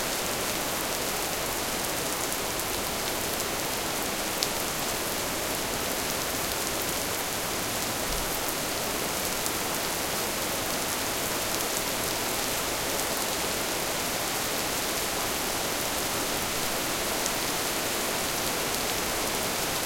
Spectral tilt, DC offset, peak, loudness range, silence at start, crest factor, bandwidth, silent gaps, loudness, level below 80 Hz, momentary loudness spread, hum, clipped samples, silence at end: -1.5 dB/octave; under 0.1%; -2 dBFS; 1 LU; 0 s; 28 dB; 17 kHz; none; -28 LUFS; -48 dBFS; 1 LU; none; under 0.1%; 0 s